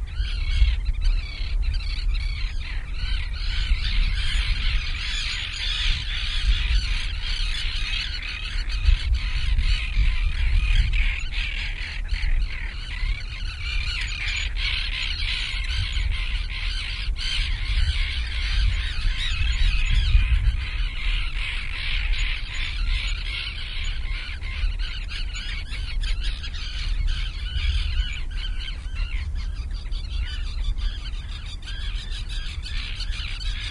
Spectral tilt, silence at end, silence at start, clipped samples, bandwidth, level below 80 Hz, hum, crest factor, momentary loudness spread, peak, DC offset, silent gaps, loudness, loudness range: -3 dB/octave; 0 s; 0 s; under 0.1%; 11 kHz; -24 dBFS; none; 18 dB; 8 LU; -6 dBFS; under 0.1%; none; -27 LUFS; 5 LU